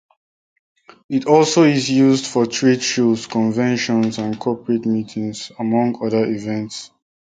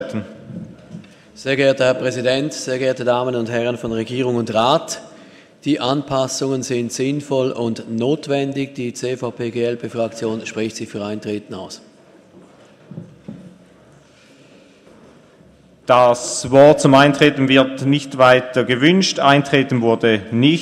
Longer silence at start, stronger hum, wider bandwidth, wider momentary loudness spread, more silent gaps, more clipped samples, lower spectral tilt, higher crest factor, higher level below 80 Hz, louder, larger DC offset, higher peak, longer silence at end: first, 1.1 s vs 0 s; neither; second, 9.4 kHz vs 13 kHz; second, 11 LU vs 19 LU; neither; neither; about the same, -5 dB/octave vs -5 dB/octave; about the same, 18 dB vs 18 dB; about the same, -60 dBFS vs -56 dBFS; about the same, -18 LUFS vs -17 LUFS; neither; about the same, 0 dBFS vs 0 dBFS; first, 0.35 s vs 0 s